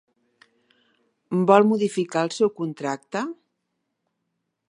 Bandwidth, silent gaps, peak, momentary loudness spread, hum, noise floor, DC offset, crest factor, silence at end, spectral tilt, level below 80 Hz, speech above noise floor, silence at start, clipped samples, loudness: 11 kHz; none; -2 dBFS; 13 LU; none; -78 dBFS; under 0.1%; 22 dB; 1.4 s; -6 dB/octave; -74 dBFS; 57 dB; 1.3 s; under 0.1%; -22 LUFS